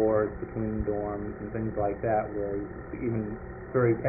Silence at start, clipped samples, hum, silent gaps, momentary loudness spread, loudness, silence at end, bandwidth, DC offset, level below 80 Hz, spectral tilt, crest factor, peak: 0 s; under 0.1%; none; none; 9 LU; -31 LUFS; 0 s; 2.6 kHz; under 0.1%; -46 dBFS; -5.5 dB/octave; 16 dB; -14 dBFS